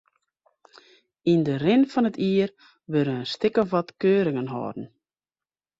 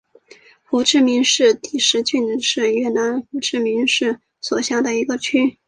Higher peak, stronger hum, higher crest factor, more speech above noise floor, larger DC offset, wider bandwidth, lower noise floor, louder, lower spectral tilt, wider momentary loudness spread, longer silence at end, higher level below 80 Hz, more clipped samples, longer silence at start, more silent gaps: second, -8 dBFS vs -2 dBFS; neither; about the same, 16 dB vs 16 dB; first, over 67 dB vs 31 dB; neither; second, 7.8 kHz vs 10 kHz; first, under -90 dBFS vs -48 dBFS; second, -24 LUFS vs -18 LUFS; first, -8 dB/octave vs -2 dB/octave; first, 11 LU vs 8 LU; first, 0.9 s vs 0.15 s; about the same, -66 dBFS vs -66 dBFS; neither; first, 1.25 s vs 0.7 s; neither